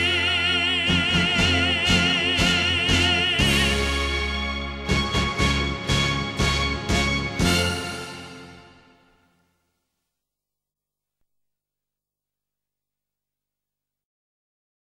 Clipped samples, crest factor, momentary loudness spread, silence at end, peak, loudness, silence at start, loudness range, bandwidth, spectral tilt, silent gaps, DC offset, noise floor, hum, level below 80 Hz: under 0.1%; 20 dB; 8 LU; 6.2 s; -6 dBFS; -21 LUFS; 0 s; 9 LU; 16 kHz; -3.5 dB/octave; none; under 0.1%; -88 dBFS; 50 Hz at -50 dBFS; -34 dBFS